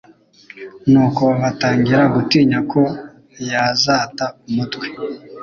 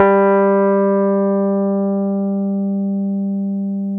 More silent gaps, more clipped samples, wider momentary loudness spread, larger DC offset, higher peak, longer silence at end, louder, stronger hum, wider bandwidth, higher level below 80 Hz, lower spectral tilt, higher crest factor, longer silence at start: neither; neither; first, 15 LU vs 7 LU; neither; about the same, -2 dBFS vs 0 dBFS; about the same, 0 s vs 0 s; about the same, -16 LUFS vs -17 LUFS; second, none vs 50 Hz at -70 dBFS; first, 7.2 kHz vs 3.1 kHz; first, -52 dBFS vs -64 dBFS; second, -5.5 dB/octave vs -12.5 dB/octave; about the same, 16 dB vs 16 dB; first, 0.55 s vs 0 s